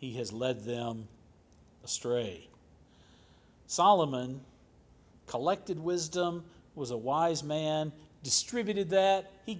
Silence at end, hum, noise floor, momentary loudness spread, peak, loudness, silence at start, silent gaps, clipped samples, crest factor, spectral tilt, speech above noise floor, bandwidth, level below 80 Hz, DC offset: 0 s; none; -61 dBFS; 17 LU; -12 dBFS; -31 LUFS; 0 s; none; under 0.1%; 22 dB; -4 dB/octave; 30 dB; 8 kHz; -66 dBFS; under 0.1%